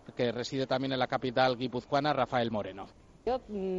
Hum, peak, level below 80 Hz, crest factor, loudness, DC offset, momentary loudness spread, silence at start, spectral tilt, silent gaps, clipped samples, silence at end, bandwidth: none; -14 dBFS; -60 dBFS; 18 dB; -31 LUFS; under 0.1%; 10 LU; 0.05 s; -6 dB/octave; none; under 0.1%; 0 s; 7.8 kHz